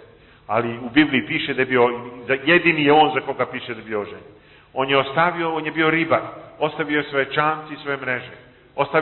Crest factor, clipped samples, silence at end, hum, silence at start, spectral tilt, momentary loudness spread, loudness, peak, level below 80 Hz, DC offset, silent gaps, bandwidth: 18 dB; under 0.1%; 0 s; none; 0.5 s; -10 dB/octave; 13 LU; -20 LUFS; -4 dBFS; -58 dBFS; under 0.1%; none; 4.3 kHz